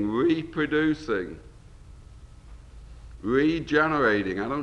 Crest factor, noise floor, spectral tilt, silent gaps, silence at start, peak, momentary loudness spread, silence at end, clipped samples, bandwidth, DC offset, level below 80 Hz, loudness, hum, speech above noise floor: 18 dB; -47 dBFS; -7 dB/octave; none; 0 s; -8 dBFS; 10 LU; 0 s; under 0.1%; 8.8 kHz; under 0.1%; -48 dBFS; -25 LUFS; none; 22 dB